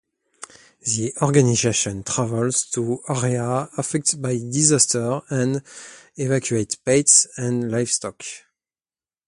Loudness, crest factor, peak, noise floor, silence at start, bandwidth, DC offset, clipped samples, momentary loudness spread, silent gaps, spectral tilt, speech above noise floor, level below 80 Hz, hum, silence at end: -20 LUFS; 22 dB; 0 dBFS; under -90 dBFS; 0.4 s; 11.5 kHz; under 0.1%; under 0.1%; 19 LU; none; -4 dB/octave; over 69 dB; -56 dBFS; none; 0.9 s